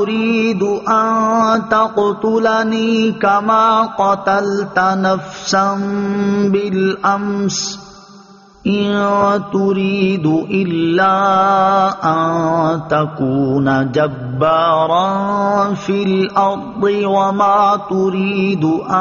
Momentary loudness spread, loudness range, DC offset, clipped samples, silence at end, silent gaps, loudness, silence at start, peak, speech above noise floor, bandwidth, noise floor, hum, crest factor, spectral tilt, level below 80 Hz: 5 LU; 3 LU; under 0.1%; under 0.1%; 0 s; none; -15 LUFS; 0 s; -2 dBFS; 27 dB; 7.2 kHz; -42 dBFS; none; 14 dB; -5 dB/octave; -52 dBFS